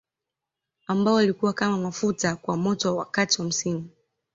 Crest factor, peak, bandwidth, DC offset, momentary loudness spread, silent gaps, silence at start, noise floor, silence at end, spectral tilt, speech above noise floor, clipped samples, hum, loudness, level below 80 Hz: 18 dB; -8 dBFS; 8 kHz; under 0.1%; 9 LU; none; 0.9 s; -87 dBFS; 0.45 s; -4 dB/octave; 63 dB; under 0.1%; none; -24 LUFS; -64 dBFS